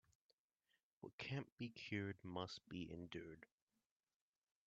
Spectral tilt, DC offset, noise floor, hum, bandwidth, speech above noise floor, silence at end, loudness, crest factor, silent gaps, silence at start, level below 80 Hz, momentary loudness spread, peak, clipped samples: -4.5 dB/octave; under 0.1%; under -90 dBFS; none; 7.6 kHz; over 39 dB; 1.2 s; -51 LUFS; 22 dB; 1.13-1.18 s, 1.52-1.57 s; 1 s; -80 dBFS; 13 LU; -32 dBFS; under 0.1%